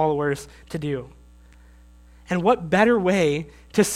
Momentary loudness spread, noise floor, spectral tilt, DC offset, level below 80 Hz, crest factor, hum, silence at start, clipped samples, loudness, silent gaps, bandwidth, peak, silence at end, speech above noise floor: 13 LU; -49 dBFS; -5.5 dB/octave; under 0.1%; -50 dBFS; 20 dB; 60 Hz at -45 dBFS; 0 s; under 0.1%; -22 LUFS; none; 16.5 kHz; -4 dBFS; 0 s; 27 dB